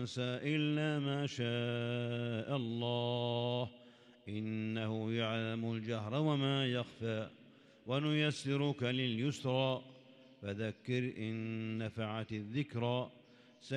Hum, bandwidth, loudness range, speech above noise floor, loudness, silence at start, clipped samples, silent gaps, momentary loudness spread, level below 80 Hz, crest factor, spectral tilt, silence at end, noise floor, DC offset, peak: none; 10.5 kHz; 3 LU; 24 dB; -37 LUFS; 0 s; under 0.1%; none; 8 LU; -78 dBFS; 18 dB; -6.5 dB/octave; 0 s; -61 dBFS; under 0.1%; -20 dBFS